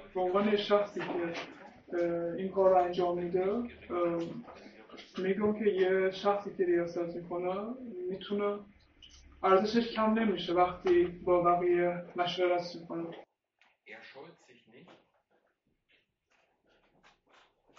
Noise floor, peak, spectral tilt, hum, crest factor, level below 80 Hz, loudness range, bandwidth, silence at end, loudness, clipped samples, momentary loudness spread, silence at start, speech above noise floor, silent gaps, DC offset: -77 dBFS; -12 dBFS; -4.5 dB/octave; none; 20 dB; -64 dBFS; 7 LU; 6.6 kHz; 3 s; -31 LUFS; under 0.1%; 17 LU; 0 s; 46 dB; none; under 0.1%